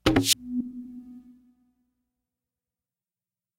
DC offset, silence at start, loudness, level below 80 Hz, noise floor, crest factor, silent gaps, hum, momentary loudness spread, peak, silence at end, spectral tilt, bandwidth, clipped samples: under 0.1%; 0.05 s; -25 LUFS; -50 dBFS; under -90 dBFS; 28 dB; none; none; 23 LU; -4 dBFS; 2.4 s; -3.5 dB/octave; 16 kHz; under 0.1%